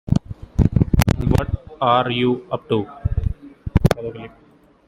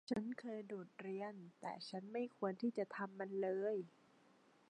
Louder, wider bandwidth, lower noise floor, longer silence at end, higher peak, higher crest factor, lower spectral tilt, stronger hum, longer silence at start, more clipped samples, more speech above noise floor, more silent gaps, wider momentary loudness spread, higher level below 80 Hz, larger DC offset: first, -20 LUFS vs -45 LUFS; first, 16.5 kHz vs 10.5 kHz; second, -52 dBFS vs -71 dBFS; second, 0.6 s vs 0.8 s; first, 0 dBFS vs -26 dBFS; about the same, 20 dB vs 18 dB; about the same, -7 dB/octave vs -6.5 dB/octave; neither; about the same, 0.05 s vs 0.1 s; neither; first, 33 dB vs 27 dB; neither; about the same, 11 LU vs 9 LU; first, -28 dBFS vs -86 dBFS; neither